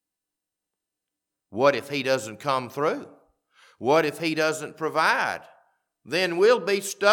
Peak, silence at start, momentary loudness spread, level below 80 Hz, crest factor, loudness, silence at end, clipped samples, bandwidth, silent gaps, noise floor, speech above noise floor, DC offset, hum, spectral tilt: -4 dBFS; 1.5 s; 9 LU; -80 dBFS; 20 dB; -24 LUFS; 0 s; under 0.1%; 19 kHz; none; -86 dBFS; 63 dB; under 0.1%; none; -3.5 dB/octave